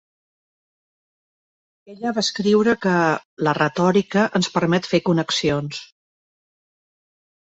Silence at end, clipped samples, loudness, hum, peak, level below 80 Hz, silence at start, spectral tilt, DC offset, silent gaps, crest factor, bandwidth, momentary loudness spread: 1.75 s; under 0.1%; -20 LUFS; none; -4 dBFS; -58 dBFS; 1.9 s; -5 dB/octave; under 0.1%; 3.25-3.37 s; 18 dB; 8.2 kHz; 8 LU